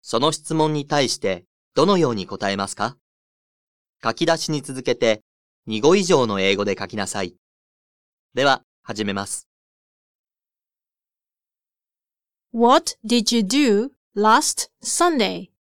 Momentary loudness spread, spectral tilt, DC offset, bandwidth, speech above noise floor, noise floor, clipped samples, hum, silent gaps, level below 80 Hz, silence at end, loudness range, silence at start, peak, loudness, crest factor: 12 LU; -4 dB/octave; 0.5%; 18 kHz; over 70 dB; under -90 dBFS; under 0.1%; none; 1.46-1.71 s, 3.01-3.93 s, 5.22-5.63 s, 7.38-8.30 s, 8.64-8.83 s, 9.46-10.24 s, 13.97-14.11 s; -58 dBFS; 0.3 s; 8 LU; 0.05 s; -2 dBFS; -20 LUFS; 20 dB